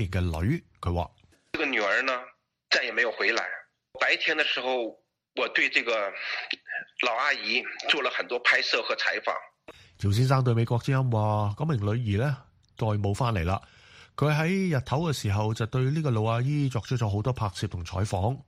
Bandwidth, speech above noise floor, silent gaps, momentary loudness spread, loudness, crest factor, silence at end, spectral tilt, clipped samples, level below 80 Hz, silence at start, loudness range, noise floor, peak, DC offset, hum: 15 kHz; 25 dB; none; 9 LU; -27 LUFS; 20 dB; 0.05 s; -5.5 dB/octave; under 0.1%; -50 dBFS; 0 s; 2 LU; -52 dBFS; -8 dBFS; under 0.1%; none